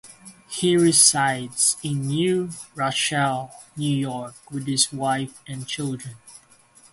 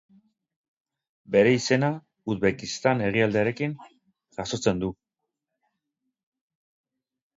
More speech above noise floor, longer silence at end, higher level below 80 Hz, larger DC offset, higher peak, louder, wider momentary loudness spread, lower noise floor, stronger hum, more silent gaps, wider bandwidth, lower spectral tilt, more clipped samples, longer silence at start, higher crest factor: second, 31 dB vs 60 dB; second, 0.55 s vs 2.45 s; about the same, -62 dBFS vs -58 dBFS; neither; first, -2 dBFS vs -6 dBFS; first, -21 LUFS vs -25 LUFS; first, 18 LU vs 14 LU; second, -54 dBFS vs -84 dBFS; neither; neither; first, 12 kHz vs 7.8 kHz; second, -3 dB/octave vs -5.5 dB/octave; neither; second, 0.05 s vs 1.3 s; about the same, 22 dB vs 22 dB